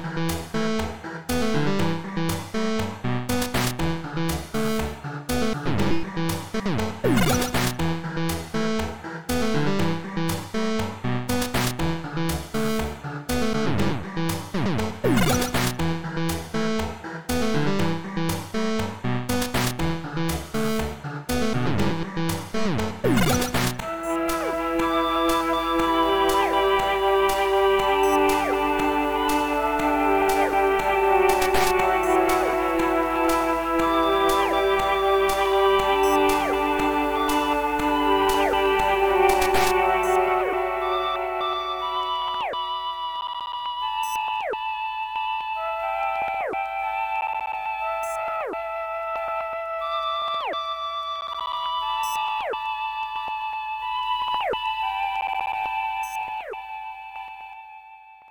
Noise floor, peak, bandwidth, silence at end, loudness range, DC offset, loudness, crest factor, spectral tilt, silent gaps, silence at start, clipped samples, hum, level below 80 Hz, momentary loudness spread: -47 dBFS; -6 dBFS; 17.5 kHz; 0 s; 7 LU; under 0.1%; -24 LUFS; 18 dB; -5 dB/octave; none; 0 s; under 0.1%; none; -42 dBFS; 8 LU